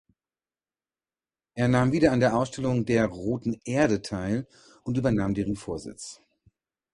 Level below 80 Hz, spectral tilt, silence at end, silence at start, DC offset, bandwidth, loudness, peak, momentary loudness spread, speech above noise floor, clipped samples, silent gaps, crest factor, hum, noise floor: -52 dBFS; -6.5 dB/octave; 0.8 s; 1.55 s; under 0.1%; 11.5 kHz; -26 LUFS; -6 dBFS; 18 LU; over 65 dB; under 0.1%; none; 20 dB; none; under -90 dBFS